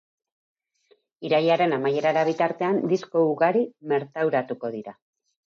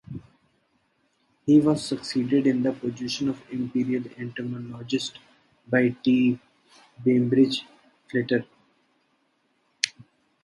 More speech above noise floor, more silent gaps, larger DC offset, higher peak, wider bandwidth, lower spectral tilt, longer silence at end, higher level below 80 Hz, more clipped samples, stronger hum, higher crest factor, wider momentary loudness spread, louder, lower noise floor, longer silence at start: second, 41 dB vs 46 dB; neither; neither; second, -8 dBFS vs 0 dBFS; second, 7.2 kHz vs 11.5 kHz; about the same, -6.5 dB/octave vs -5.5 dB/octave; first, 0.55 s vs 0.4 s; second, -80 dBFS vs -64 dBFS; neither; neither; second, 16 dB vs 26 dB; about the same, 11 LU vs 13 LU; about the same, -24 LUFS vs -25 LUFS; second, -64 dBFS vs -70 dBFS; first, 1.2 s vs 0.1 s